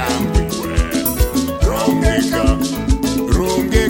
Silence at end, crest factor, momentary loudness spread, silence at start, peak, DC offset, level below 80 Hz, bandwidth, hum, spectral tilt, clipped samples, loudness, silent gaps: 0 s; 14 dB; 3 LU; 0 s; 0 dBFS; under 0.1%; -20 dBFS; 17 kHz; none; -5.5 dB/octave; under 0.1%; -17 LUFS; none